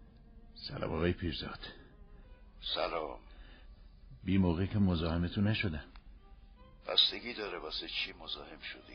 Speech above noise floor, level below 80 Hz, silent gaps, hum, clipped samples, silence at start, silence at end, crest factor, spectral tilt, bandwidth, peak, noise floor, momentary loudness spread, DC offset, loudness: 22 dB; -52 dBFS; none; none; under 0.1%; 0 s; 0 s; 24 dB; -4 dB/octave; 6.4 kHz; -12 dBFS; -56 dBFS; 16 LU; under 0.1%; -34 LUFS